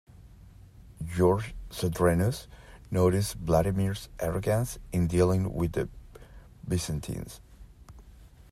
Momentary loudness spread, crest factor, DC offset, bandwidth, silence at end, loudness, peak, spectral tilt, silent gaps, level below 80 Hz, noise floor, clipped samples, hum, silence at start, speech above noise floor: 14 LU; 18 dB; under 0.1%; 15.5 kHz; 0.1 s; -29 LUFS; -12 dBFS; -6.5 dB/octave; none; -46 dBFS; -52 dBFS; under 0.1%; none; 0.2 s; 25 dB